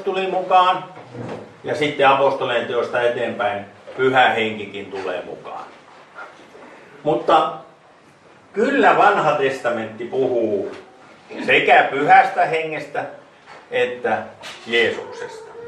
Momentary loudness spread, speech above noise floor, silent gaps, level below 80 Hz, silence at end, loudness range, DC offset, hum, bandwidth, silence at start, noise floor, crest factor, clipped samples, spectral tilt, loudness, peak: 21 LU; 31 dB; none; -66 dBFS; 0 s; 6 LU; under 0.1%; none; 10.5 kHz; 0 s; -49 dBFS; 18 dB; under 0.1%; -5 dB/octave; -18 LUFS; -2 dBFS